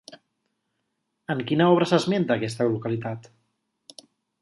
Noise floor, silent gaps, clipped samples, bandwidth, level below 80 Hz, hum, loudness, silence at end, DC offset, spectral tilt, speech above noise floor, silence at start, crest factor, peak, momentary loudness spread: -77 dBFS; none; under 0.1%; 11.5 kHz; -66 dBFS; none; -23 LUFS; 1.2 s; under 0.1%; -6.5 dB/octave; 55 dB; 0.1 s; 20 dB; -6 dBFS; 15 LU